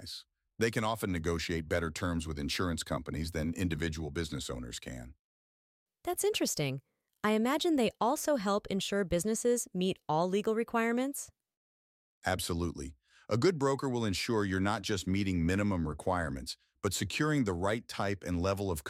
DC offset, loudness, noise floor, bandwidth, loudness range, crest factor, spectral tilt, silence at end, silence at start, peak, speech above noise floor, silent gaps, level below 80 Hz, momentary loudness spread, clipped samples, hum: under 0.1%; -33 LUFS; under -90 dBFS; 16 kHz; 5 LU; 18 dB; -5 dB/octave; 0 s; 0 s; -16 dBFS; over 58 dB; 5.19-5.86 s, 11.57-12.22 s; -52 dBFS; 9 LU; under 0.1%; none